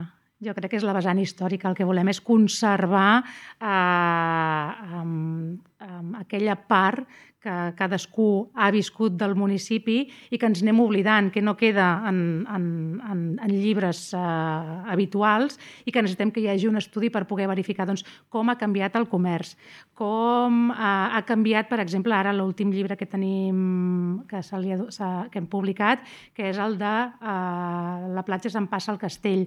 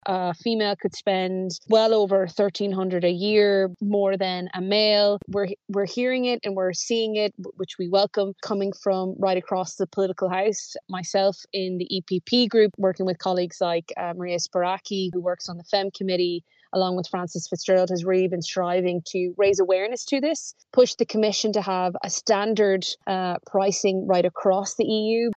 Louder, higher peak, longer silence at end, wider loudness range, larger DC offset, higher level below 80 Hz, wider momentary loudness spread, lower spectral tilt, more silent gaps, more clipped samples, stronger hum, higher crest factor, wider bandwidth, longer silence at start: about the same, -24 LUFS vs -24 LUFS; about the same, -4 dBFS vs -6 dBFS; about the same, 0 s vs 0.05 s; about the same, 5 LU vs 4 LU; neither; about the same, -76 dBFS vs -72 dBFS; first, 11 LU vs 8 LU; first, -6 dB/octave vs -4.5 dB/octave; neither; neither; neither; about the same, 20 dB vs 16 dB; first, 11.5 kHz vs 8.6 kHz; about the same, 0 s vs 0.05 s